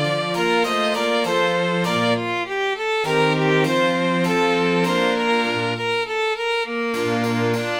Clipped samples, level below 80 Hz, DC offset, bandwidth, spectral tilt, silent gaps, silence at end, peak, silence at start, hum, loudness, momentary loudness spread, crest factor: under 0.1%; -58 dBFS; under 0.1%; 19 kHz; -5 dB/octave; none; 0 s; -6 dBFS; 0 s; none; -20 LUFS; 4 LU; 14 dB